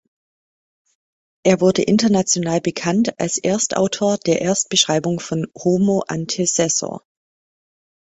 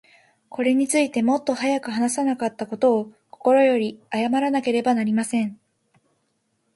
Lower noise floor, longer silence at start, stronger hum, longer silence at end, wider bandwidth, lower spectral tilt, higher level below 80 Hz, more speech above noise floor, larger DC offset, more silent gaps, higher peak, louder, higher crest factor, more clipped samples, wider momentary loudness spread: first, under -90 dBFS vs -71 dBFS; first, 1.45 s vs 0.5 s; neither; second, 1.05 s vs 1.2 s; second, 8.4 kHz vs 11.5 kHz; about the same, -4 dB/octave vs -4.5 dB/octave; first, -58 dBFS vs -70 dBFS; first, over 72 dB vs 50 dB; neither; neither; first, -2 dBFS vs -6 dBFS; first, -18 LUFS vs -22 LUFS; about the same, 18 dB vs 16 dB; neither; about the same, 6 LU vs 8 LU